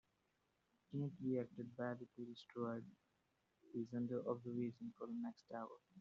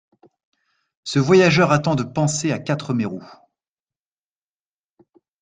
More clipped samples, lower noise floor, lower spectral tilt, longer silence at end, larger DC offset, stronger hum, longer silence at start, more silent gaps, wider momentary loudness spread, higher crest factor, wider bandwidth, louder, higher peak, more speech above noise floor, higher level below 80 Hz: neither; second, -84 dBFS vs under -90 dBFS; first, -7.5 dB/octave vs -5.5 dB/octave; second, 0 s vs 2.15 s; neither; second, none vs 50 Hz at -40 dBFS; second, 0.9 s vs 1.05 s; neither; second, 9 LU vs 13 LU; about the same, 18 dB vs 20 dB; second, 7.2 kHz vs 9.6 kHz; second, -48 LUFS vs -19 LUFS; second, -30 dBFS vs -2 dBFS; second, 37 dB vs over 72 dB; second, -86 dBFS vs -58 dBFS